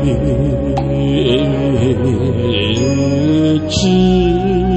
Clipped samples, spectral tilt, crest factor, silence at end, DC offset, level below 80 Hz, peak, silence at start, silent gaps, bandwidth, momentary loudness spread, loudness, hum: under 0.1%; -6.5 dB/octave; 12 dB; 0 s; under 0.1%; -26 dBFS; -2 dBFS; 0 s; none; 8.6 kHz; 4 LU; -14 LUFS; none